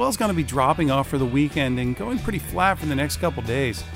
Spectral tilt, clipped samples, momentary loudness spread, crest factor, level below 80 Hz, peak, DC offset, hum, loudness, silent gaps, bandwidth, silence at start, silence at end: -5.5 dB/octave; under 0.1%; 5 LU; 16 dB; -40 dBFS; -6 dBFS; under 0.1%; none; -23 LUFS; none; 16 kHz; 0 s; 0 s